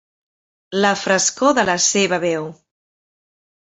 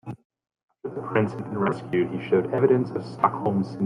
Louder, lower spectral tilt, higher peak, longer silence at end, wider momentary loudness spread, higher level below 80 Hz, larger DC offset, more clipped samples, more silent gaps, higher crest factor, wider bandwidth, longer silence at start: first, -17 LUFS vs -25 LUFS; second, -2.5 dB/octave vs -9 dB/octave; about the same, -2 dBFS vs -4 dBFS; first, 1.25 s vs 0 s; second, 10 LU vs 15 LU; about the same, -60 dBFS vs -64 dBFS; neither; neither; second, none vs 0.25-0.30 s, 0.63-0.68 s; about the same, 18 dB vs 20 dB; second, 8.4 kHz vs 10 kHz; first, 0.7 s vs 0.05 s